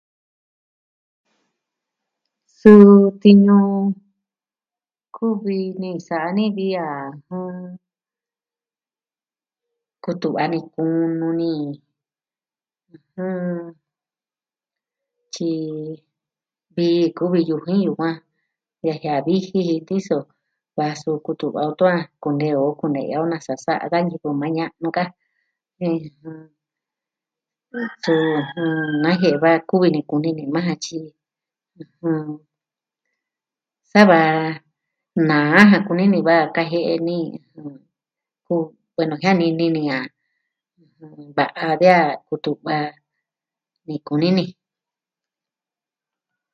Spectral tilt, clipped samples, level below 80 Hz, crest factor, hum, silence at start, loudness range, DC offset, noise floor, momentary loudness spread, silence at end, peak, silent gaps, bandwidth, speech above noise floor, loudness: -7 dB/octave; under 0.1%; -66 dBFS; 20 dB; none; 2.65 s; 15 LU; under 0.1%; under -90 dBFS; 18 LU; 2 s; 0 dBFS; none; 7.2 kHz; over 72 dB; -18 LUFS